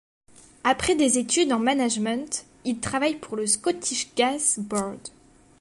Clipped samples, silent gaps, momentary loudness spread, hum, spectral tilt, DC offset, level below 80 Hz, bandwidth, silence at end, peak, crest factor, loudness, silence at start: under 0.1%; none; 9 LU; none; -2.5 dB/octave; under 0.1%; -56 dBFS; 11.5 kHz; 0.5 s; -8 dBFS; 18 dB; -24 LUFS; 0.65 s